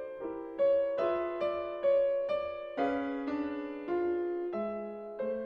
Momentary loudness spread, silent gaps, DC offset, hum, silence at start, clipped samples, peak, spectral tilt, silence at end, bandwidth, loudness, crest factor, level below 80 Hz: 10 LU; none; under 0.1%; none; 0 s; under 0.1%; -18 dBFS; -7.5 dB/octave; 0 s; 5.8 kHz; -33 LUFS; 14 dB; -66 dBFS